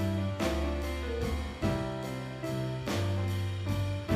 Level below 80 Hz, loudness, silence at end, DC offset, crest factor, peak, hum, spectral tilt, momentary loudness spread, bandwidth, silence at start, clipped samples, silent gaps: -40 dBFS; -33 LUFS; 0 s; under 0.1%; 16 dB; -16 dBFS; none; -6.5 dB/octave; 4 LU; 15 kHz; 0 s; under 0.1%; none